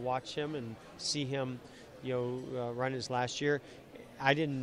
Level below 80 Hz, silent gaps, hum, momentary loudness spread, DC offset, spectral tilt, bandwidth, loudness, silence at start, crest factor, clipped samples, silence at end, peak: -68 dBFS; none; none; 16 LU; under 0.1%; -4.5 dB/octave; 12.5 kHz; -35 LUFS; 0 s; 24 dB; under 0.1%; 0 s; -12 dBFS